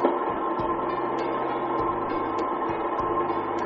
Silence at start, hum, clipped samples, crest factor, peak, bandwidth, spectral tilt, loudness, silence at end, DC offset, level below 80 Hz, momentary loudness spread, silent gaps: 0 s; none; under 0.1%; 20 dB; -6 dBFS; 6.8 kHz; -5 dB/octave; -27 LUFS; 0 s; under 0.1%; -52 dBFS; 2 LU; none